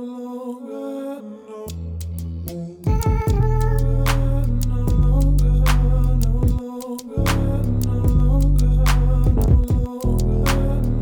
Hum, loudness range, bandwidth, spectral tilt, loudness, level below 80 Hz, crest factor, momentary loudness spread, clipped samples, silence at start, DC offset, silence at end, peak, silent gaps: none; 5 LU; 19.5 kHz; -7 dB/octave; -21 LUFS; -20 dBFS; 14 dB; 13 LU; under 0.1%; 0 s; under 0.1%; 0 s; -4 dBFS; none